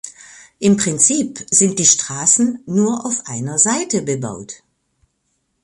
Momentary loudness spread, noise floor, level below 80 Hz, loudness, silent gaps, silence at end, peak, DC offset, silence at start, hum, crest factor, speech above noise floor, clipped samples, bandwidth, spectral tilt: 11 LU; -69 dBFS; -58 dBFS; -15 LUFS; none; 1.1 s; 0 dBFS; under 0.1%; 0.05 s; none; 18 dB; 52 dB; under 0.1%; 11.5 kHz; -3.5 dB/octave